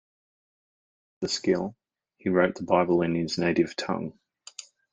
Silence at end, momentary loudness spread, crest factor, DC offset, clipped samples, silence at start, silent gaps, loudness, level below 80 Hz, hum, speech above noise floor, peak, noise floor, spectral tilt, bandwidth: 0.8 s; 19 LU; 22 dB; under 0.1%; under 0.1%; 1.2 s; none; -26 LUFS; -64 dBFS; none; 22 dB; -6 dBFS; -48 dBFS; -5.5 dB/octave; 9.6 kHz